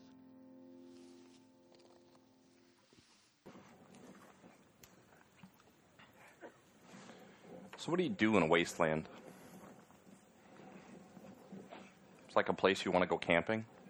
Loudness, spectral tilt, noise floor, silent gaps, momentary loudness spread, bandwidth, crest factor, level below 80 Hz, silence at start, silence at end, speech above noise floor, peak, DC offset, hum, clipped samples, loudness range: -34 LUFS; -5 dB/octave; -68 dBFS; none; 27 LU; over 20 kHz; 26 dB; -74 dBFS; 0.6 s; 0.25 s; 34 dB; -14 dBFS; under 0.1%; none; under 0.1%; 24 LU